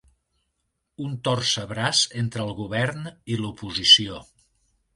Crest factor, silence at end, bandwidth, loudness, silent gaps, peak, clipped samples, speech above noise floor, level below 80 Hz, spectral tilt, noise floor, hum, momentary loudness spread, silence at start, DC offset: 24 dB; 0.75 s; 11.5 kHz; -21 LUFS; none; -2 dBFS; under 0.1%; 53 dB; -56 dBFS; -3 dB/octave; -76 dBFS; none; 19 LU; 1 s; under 0.1%